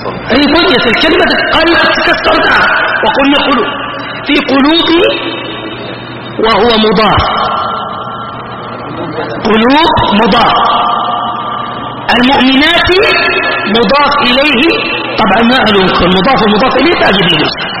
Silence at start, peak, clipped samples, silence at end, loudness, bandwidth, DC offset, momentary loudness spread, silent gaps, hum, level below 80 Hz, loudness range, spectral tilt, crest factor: 0 s; 0 dBFS; 0.3%; 0 s; -8 LUFS; 13 kHz; under 0.1%; 12 LU; none; none; -32 dBFS; 4 LU; -6 dB/octave; 8 dB